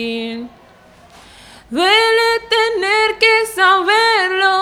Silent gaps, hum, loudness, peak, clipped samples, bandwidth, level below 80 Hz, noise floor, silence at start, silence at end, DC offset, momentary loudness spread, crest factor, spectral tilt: none; none; -13 LUFS; 0 dBFS; under 0.1%; 16 kHz; -54 dBFS; -45 dBFS; 0 s; 0 s; under 0.1%; 12 LU; 16 dB; -1.5 dB/octave